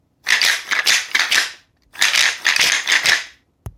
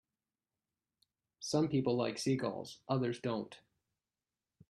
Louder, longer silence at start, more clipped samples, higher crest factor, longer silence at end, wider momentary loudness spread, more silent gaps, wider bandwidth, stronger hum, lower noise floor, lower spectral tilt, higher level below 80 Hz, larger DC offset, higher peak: first, -15 LUFS vs -36 LUFS; second, 0.25 s vs 1.4 s; neither; about the same, 18 dB vs 20 dB; second, 0.05 s vs 1.15 s; second, 5 LU vs 12 LU; neither; first, 18 kHz vs 13 kHz; neither; second, -42 dBFS vs under -90 dBFS; second, 2 dB/octave vs -6 dB/octave; first, -52 dBFS vs -74 dBFS; neither; first, 0 dBFS vs -18 dBFS